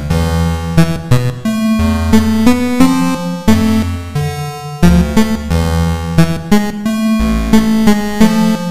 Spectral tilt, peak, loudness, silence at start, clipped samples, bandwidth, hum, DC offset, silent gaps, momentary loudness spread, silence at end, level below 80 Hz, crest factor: -6.5 dB/octave; 0 dBFS; -13 LUFS; 0 s; 0.4%; 16 kHz; none; under 0.1%; none; 6 LU; 0 s; -22 dBFS; 12 dB